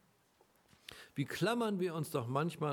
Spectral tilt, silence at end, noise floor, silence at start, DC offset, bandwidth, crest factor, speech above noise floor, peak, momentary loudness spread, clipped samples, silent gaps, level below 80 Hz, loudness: -6 dB/octave; 0 s; -71 dBFS; 0.9 s; under 0.1%; 19 kHz; 18 dB; 35 dB; -20 dBFS; 19 LU; under 0.1%; none; -78 dBFS; -37 LUFS